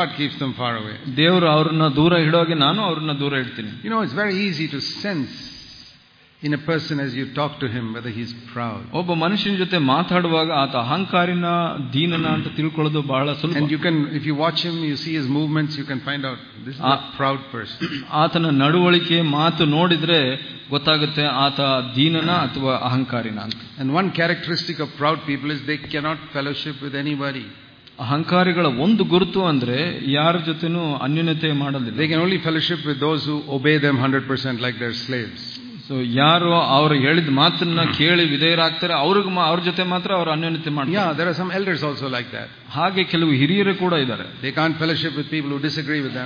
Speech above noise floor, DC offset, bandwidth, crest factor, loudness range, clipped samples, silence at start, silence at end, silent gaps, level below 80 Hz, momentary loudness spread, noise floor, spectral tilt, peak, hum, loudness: 31 dB; under 0.1%; 5.2 kHz; 18 dB; 7 LU; under 0.1%; 0 s; 0 s; none; -58 dBFS; 11 LU; -52 dBFS; -7 dB/octave; -2 dBFS; none; -20 LUFS